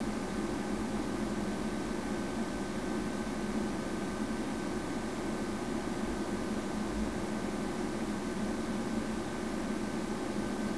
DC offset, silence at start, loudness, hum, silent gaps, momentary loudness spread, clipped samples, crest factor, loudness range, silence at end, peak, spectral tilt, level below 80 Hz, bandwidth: 0.4%; 0 s; -36 LUFS; none; none; 1 LU; under 0.1%; 12 dB; 0 LU; 0 s; -22 dBFS; -5.5 dB/octave; -50 dBFS; 11 kHz